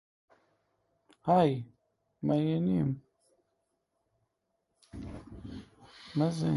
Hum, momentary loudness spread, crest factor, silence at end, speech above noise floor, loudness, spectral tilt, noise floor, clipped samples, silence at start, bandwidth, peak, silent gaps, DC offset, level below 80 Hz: none; 22 LU; 20 dB; 0 s; 53 dB; -30 LUFS; -8.5 dB/octave; -81 dBFS; under 0.1%; 1.25 s; 11.5 kHz; -14 dBFS; none; under 0.1%; -60 dBFS